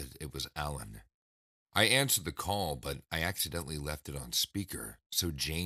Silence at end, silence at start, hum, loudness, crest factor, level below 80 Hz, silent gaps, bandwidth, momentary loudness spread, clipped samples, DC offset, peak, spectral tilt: 0 s; 0 s; none; -33 LUFS; 26 dB; -50 dBFS; 1.14-1.66 s, 5.06-5.10 s; 15.5 kHz; 14 LU; under 0.1%; under 0.1%; -10 dBFS; -2.5 dB/octave